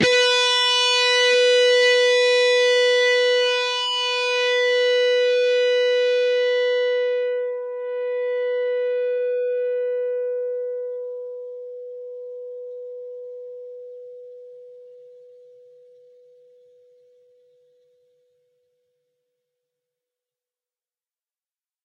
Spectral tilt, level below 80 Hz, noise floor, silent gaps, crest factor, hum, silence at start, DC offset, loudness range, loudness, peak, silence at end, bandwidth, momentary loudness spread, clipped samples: -1 dB/octave; -74 dBFS; under -90 dBFS; none; 16 dB; none; 0 s; under 0.1%; 21 LU; -19 LUFS; -8 dBFS; 6.75 s; 10.5 kHz; 20 LU; under 0.1%